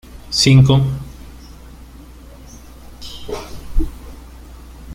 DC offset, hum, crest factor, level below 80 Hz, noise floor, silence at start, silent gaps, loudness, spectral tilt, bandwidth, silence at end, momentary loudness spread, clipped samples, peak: under 0.1%; none; 18 dB; -30 dBFS; -38 dBFS; 0.15 s; none; -16 LUFS; -5.5 dB/octave; 14 kHz; 0 s; 29 LU; under 0.1%; -2 dBFS